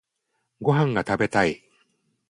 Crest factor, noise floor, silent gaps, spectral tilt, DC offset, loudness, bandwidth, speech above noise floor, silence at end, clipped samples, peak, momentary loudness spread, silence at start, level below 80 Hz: 20 dB; -76 dBFS; none; -6.5 dB/octave; under 0.1%; -23 LUFS; 11.5 kHz; 54 dB; 0.75 s; under 0.1%; -6 dBFS; 6 LU; 0.6 s; -56 dBFS